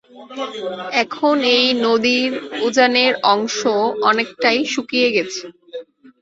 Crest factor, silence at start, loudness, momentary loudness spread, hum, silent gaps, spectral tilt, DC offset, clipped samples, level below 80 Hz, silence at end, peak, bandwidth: 16 dB; 0.15 s; -17 LUFS; 15 LU; none; none; -2.5 dB/octave; under 0.1%; under 0.1%; -64 dBFS; 0.4 s; -2 dBFS; 8 kHz